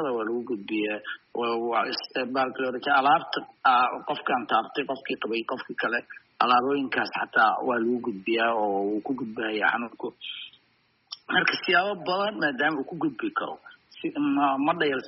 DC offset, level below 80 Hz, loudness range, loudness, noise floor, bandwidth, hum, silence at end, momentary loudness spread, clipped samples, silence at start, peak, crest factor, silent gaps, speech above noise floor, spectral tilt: under 0.1%; -74 dBFS; 3 LU; -26 LUFS; -67 dBFS; 5.8 kHz; none; 0 s; 12 LU; under 0.1%; 0 s; -8 dBFS; 18 dB; none; 41 dB; -1.5 dB/octave